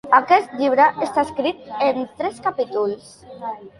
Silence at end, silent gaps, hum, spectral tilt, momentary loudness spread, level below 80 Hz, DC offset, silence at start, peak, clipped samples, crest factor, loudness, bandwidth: 0.1 s; none; none; -4.5 dB/octave; 15 LU; -60 dBFS; under 0.1%; 0.05 s; -2 dBFS; under 0.1%; 18 dB; -20 LUFS; 11.5 kHz